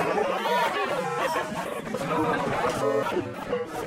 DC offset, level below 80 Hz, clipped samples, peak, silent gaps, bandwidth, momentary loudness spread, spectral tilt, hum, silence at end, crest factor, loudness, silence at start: under 0.1%; -56 dBFS; under 0.1%; -12 dBFS; none; 16 kHz; 7 LU; -4.5 dB/octave; none; 0 s; 14 dB; -27 LUFS; 0 s